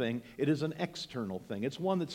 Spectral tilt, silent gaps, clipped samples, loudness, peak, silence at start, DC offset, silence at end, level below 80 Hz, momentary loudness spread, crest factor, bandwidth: -6.5 dB/octave; none; under 0.1%; -35 LUFS; -18 dBFS; 0 s; under 0.1%; 0 s; -70 dBFS; 7 LU; 16 dB; 16.5 kHz